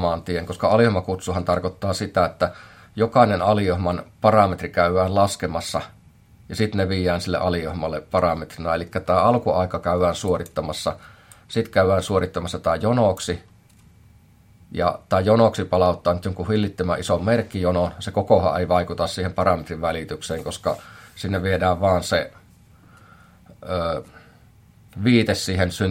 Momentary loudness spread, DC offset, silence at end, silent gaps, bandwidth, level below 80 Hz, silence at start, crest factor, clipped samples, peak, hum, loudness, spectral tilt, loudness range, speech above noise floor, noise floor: 10 LU; under 0.1%; 0 s; none; 16.5 kHz; -50 dBFS; 0 s; 20 dB; under 0.1%; -2 dBFS; none; -22 LUFS; -6 dB/octave; 5 LU; 31 dB; -52 dBFS